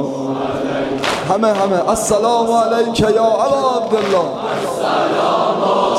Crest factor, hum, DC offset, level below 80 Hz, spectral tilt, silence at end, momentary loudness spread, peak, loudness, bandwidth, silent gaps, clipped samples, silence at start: 14 dB; none; under 0.1%; -46 dBFS; -4.5 dB/octave; 0 s; 6 LU; -2 dBFS; -16 LUFS; 15.5 kHz; none; under 0.1%; 0 s